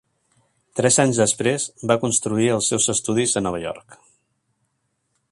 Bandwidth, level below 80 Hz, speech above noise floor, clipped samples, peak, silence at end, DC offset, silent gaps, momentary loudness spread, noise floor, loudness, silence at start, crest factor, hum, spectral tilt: 11.5 kHz; -56 dBFS; 52 dB; under 0.1%; -2 dBFS; 1.35 s; under 0.1%; none; 12 LU; -72 dBFS; -20 LUFS; 0.75 s; 22 dB; none; -3.5 dB/octave